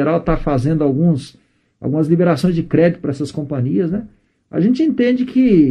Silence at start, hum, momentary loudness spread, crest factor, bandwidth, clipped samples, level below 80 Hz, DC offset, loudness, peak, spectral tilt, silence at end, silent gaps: 0 s; none; 8 LU; 16 dB; 10 kHz; under 0.1%; -36 dBFS; under 0.1%; -16 LUFS; 0 dBFS; -8.5 dB/octave; 0 s; none